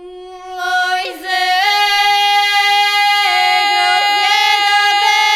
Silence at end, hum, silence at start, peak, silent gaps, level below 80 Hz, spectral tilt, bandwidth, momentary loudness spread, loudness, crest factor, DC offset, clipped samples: 0 s; none; 0 s; 0 dBFS; none; -58 dBFS; 2.5 dB/octave; 19 kHz; 7 LU; -12 LUFS; 14 dB; under 0.1%; under 0.1%